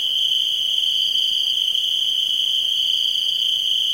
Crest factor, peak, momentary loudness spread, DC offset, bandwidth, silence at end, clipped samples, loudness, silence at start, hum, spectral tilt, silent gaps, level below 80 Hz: 12 dB; -8 dBFS; 1 LU; under 0.1%; 16.5 kHz; 0 s; under 0.1%; -17 LUFS; 0 s; none; 2.5 dB/octave; none; -66 dBFS